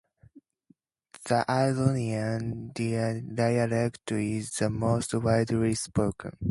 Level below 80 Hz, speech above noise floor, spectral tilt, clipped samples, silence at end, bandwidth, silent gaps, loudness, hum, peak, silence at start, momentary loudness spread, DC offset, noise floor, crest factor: -52 dBFS; 38 dB; -6 dB/octave; under 0.1%; 0 s; 11.5 kHz; none; -28 LUFS; none; -10 dBFS; 0.35 s; 6 LU; under 0.1%; -65 dBFS; 20 dB